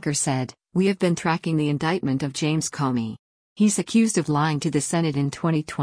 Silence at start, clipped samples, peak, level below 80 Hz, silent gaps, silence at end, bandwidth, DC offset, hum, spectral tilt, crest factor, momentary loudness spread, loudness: 0 s; under 0.1%; -8 dBFS; -60 dBFS; 3.19-3.56 s; 0 s; 10.5 kHz; under 0.1%; none; -5 dB/octave; 14 dB; 5 LU; -23 LUFS